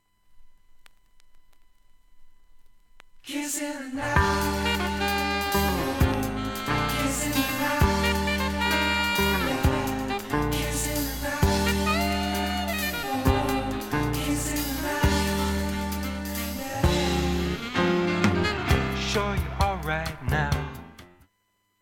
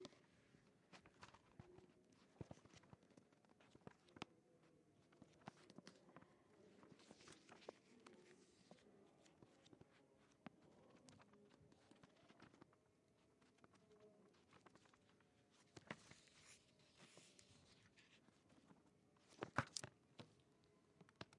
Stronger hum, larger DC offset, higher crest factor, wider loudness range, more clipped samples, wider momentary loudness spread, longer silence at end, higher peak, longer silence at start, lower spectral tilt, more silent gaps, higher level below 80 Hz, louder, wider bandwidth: neither; neither; second, 22 dB vs 40 dB; second, 4 LU vs 13 LU; neither; second, 7 LU vs 15 LU; first, 0.75 s vs 0 s; first, -4 dBFS vs -24 dBFS; first, 0.3 s vs 0 s; about the same, -4.5 dB/octave vs -4 dB/octave; neither; first, -34 dBFS vs -90 dBFS; first, -26 LUFS vs -60 LUFS; first, 17.5 kHz vs 11 kHz